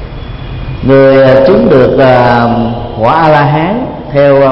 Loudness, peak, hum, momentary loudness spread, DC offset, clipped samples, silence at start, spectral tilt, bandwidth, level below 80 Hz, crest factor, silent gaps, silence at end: -7 LUFS; 0 dBFS; none; 16 LU; under 0.1%; 0.9%; 0 s; -9 dB/octave; 5.8 kHz; -26 dBFS; 6 dB; none; 0 s